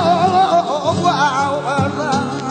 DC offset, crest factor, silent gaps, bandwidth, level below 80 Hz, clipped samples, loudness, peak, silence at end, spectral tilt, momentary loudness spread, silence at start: under 0.1%; 12 dB; none; 9.2 kHz; -52 dBFS; under 0.1%; -16 LUFS; -2 dBFS; 0 s; -5 dB/octave; 5 LU; 0 s